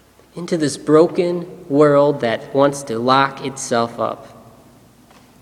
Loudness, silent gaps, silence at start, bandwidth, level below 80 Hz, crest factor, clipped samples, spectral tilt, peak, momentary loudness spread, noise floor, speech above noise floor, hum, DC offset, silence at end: -17 LUFS; none; 0.35 s; 13.5 kHz; -60 dBFS; 18 dB; under 0.1%; -5.5 dB/octave; 0 dBFS; 13 LU; -48 dBFS; 31 dB; none; under 0.1%; 1.15 s